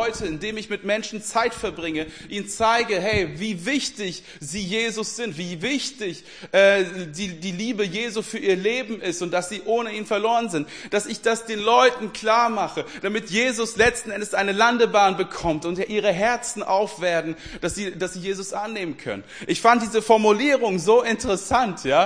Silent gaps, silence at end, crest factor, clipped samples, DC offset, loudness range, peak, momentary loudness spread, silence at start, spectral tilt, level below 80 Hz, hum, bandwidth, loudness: none; 0 s; 20 dB; under 0.1%; 0.2%; 4 LU; -2 dBFS; 12 LU; 0 s; -3.5 dB/octave; -50 dBFS; none; 10.5 kHz; -22 LUFS